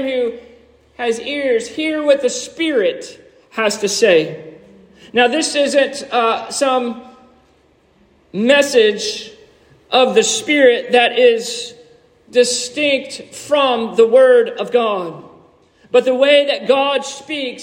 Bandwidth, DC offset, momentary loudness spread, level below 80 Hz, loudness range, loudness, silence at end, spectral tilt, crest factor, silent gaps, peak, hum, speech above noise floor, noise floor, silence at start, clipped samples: 16 kHz; under 0.1%; 14 LU; -62 dBFS; 4 LU; -15 LUFS; 0 s; -2.5 dB/octave; 16 dB; none; 0 dBFS; none; 39 dB; -54 dBFS; 0 s; under 0.1%